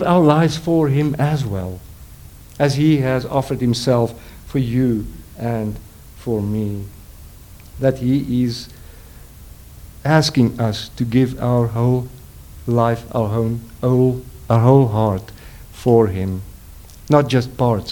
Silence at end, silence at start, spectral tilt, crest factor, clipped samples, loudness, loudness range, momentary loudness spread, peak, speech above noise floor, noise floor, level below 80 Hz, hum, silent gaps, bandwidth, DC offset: 0 s; 0 s; -7 dB/octave; 18 dB; under 0.1%; -18 LUFS; 6 LU; 16 LU; 0 dBFS; 23 dB; -40 dBFS; -40 dBFS; none; none; 19 kHz; under 0.1%